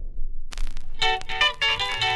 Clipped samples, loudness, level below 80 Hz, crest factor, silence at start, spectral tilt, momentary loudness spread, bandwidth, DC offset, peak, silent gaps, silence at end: under 0.1%; -22 LUFS; -32 dBFS; 14 dB; 0 s; -1.5 dB/octave; 18 LU; 11.5 kHz; under 0.1%; -8 dBFS; none; 0 s